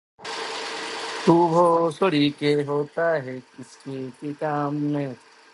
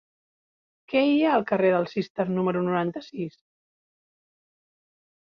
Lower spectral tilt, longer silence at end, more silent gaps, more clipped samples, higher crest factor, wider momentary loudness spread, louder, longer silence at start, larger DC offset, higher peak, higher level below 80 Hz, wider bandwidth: second, -6 dB/octave vs -8 dB/octave; second, 0.4 s vs 1.95 s; second, none vs 2.10-2.15 s; neither; about the same, 20 dB vs 18 dB; first, 16 LU vs 13 LU; about the same, -23 LUFS vs -24 LUFS; second, 0.2 s vs 0.9 s; neither; first, -2 dBFS vs -8 dBFS; about the same, -70 dBFS vs -70 dBFS; first, 11.5 kHz vs 6.6 kHz